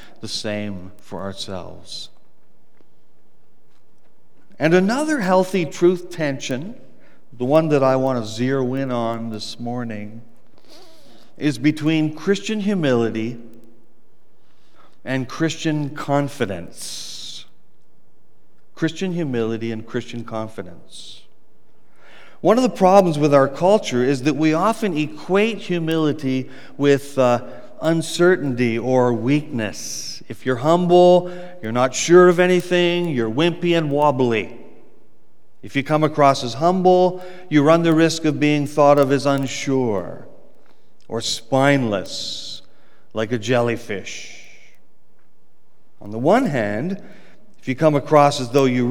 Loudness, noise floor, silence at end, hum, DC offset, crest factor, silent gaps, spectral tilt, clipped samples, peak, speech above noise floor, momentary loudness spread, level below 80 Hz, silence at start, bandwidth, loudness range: -19 LUFS; -64 dBFS; 0 s; none; 2%; 20 dB; none; -5.5 dB/octave; under 0.1%; 0 dBFS; 45 dB; 17 LU; -66 dBFS; 0.2 s; 17.5 kHz; 10 LU